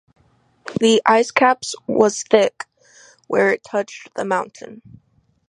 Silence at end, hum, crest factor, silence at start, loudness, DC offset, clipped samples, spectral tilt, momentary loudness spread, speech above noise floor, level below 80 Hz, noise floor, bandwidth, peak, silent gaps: 0.75 s; none; 20 dB; 0.65 s; -18 LUFS; under 0.1%; under 0.1%; -3.5 dB/octave; 21 LU; 40 dB; -64 dBFS; -58 dBFS; 11 kHz; 0 dBFS; none